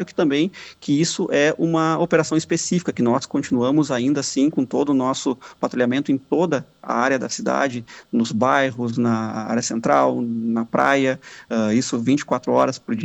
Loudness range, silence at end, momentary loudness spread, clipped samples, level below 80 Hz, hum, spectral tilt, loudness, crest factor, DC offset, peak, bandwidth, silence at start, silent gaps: 2 LU; 0 s; 6 LU; under 0.1%; -62 dBFS; none; -5 dB/octave; -20 LUFS; 16 dB; under 0.1%; -4 dBFS; 8.4 kHz; 0 s; none